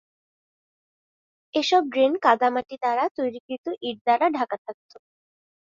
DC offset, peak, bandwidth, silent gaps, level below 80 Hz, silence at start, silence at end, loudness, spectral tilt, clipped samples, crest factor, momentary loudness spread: under 0.1%; -4 dBFS; 7.6 kHz; 3.11-3.15 s, 3.40-3.49 s, 3.58-3.64 s, 4.01-4.05 s, 4.58-4.65 s; -74 dBFS; 1.55 s; 0.95 s; -23 LUFS; -3.5 dB/octave; under 0.1%; 22 dB; 12 LU